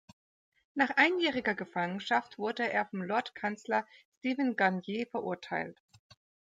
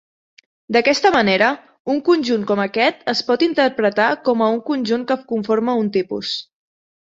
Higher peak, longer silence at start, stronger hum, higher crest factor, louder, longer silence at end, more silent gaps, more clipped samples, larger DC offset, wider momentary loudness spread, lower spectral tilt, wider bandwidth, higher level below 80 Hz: second, -10 dBFS vs -2 dBFS; about the same, 0.75 s vs 0.7 s; neither; first, 22 dB vs 16 dB; second, -32 LUFS vs -18 LUFS; first, 0.8 s vs 0.6 s; first, 4.05-4.21 s vs 1.80-1.85 s; neither; neither; first, 11 LU vs 7 LU; about the same, -5.5 dB/octave vs -4.5 dB/octave; about the same, 7.8 kHz vs 7.8 kHz; second, -76 dBFS vs -62 dBFS